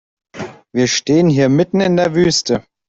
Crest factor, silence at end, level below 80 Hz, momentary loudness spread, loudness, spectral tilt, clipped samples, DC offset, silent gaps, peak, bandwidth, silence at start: 12 dB; 0.3 s; -50 dBFS; 16 LU; -14 LUFS; -5 dB/octave; under 0.1%; under 0.1%; none; -2 dBFS; 8 kHz; 0.35 s